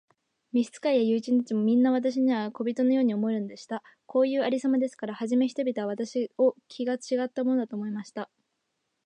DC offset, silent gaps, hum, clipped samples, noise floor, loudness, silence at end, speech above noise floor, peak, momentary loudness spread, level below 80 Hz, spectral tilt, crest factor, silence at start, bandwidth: under 0.1%; none; none; under 0.1%; -79 dBFS; -27 LUFS; 0.8 s; 53 dB; -14 dBFS; 11 LU; -82 dBFS; -6 dB/octave; 14 dB; 0.55 s; 9.4 kHz